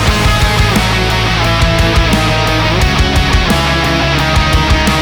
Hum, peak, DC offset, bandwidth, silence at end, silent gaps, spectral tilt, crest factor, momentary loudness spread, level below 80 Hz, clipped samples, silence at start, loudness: none; 0 dBFS; under 0.1%; over 20 kHz; 0 s; none; -4.5 dB/octave; 10 dB; 1 LU; -16 dBFS; under 0.1%; 0 s; -11 LUFS